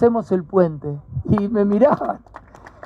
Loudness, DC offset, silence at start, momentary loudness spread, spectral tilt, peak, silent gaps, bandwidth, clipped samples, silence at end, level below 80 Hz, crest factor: -19 LUFS; under 0.1%; 0 s; 13 LU; -10 dB/octave; -4 dBFS; none; 6.4 kHz; under 0.1%; 0.15 s; -46 dBFS; 16 dB